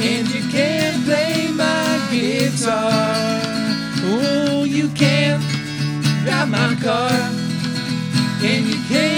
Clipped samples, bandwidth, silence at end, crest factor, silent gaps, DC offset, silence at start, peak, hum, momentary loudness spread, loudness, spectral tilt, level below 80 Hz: under 0.1%; over 20 kHz; 0 s; 16 dB; none; under 0.1%; 0 s; -2 dBFS; none; 4 LU; -18 LUFS; -5 dB/octave; -52 dBFS